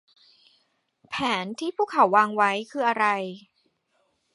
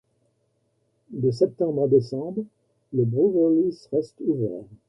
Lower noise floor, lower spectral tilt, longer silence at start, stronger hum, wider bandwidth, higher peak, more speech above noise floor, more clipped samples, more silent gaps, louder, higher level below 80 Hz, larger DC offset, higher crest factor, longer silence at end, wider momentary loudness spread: about the same, -71 dBFS vs -70 dBFS; second, -4.5 dB/octave vs -10 dB/octave; about the same, 1.1 s vs 1.1 s; neither; first, 11.5 kHz vs 9.2 kHz; about the same, -6 dBFS vs -6 dBFS; about the same, 47 dB vs 47 dB; neither; neither; about the same, -24 LUFS vs -24 LUFS; second, -72 dBFS vs -64 dBFS; neither; about the same, 22 dB vs 18 dB; first, 0.95 s vs 0.15 s; first, 14 LU vs 11 LU